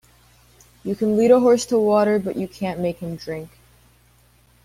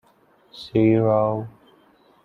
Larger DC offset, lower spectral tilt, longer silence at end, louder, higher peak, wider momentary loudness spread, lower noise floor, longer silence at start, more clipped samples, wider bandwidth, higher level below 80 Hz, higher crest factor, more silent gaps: neither; second, -6 dB/octave vs -9.5 dB/octave; first, 1.2 s vs 0.75 s; about the same, -20 LUFS vs -20 LUFS; first, -2 dBFS vs -6 dBFS; second, 16 LU vs 21 LU; about the same, -56 dBFS vs -58 dBFS; first, 0.85 s vs 0.55 s; neither; first, 15.5 kHz vs 6 kHz; about the same, -56 dBFS vs -56 dBFS; about the same, 20 dB vs 18 dB; neither